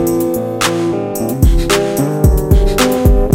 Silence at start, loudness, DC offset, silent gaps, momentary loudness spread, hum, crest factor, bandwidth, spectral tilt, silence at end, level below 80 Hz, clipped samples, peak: 0 s; -14 LUFS; under 0.1%; none; 6 LU; none; 12 dB; 17 kHz; -5.5 dB/octave; 0 s; -16 dBFS; under 0.1%; 0 dBFS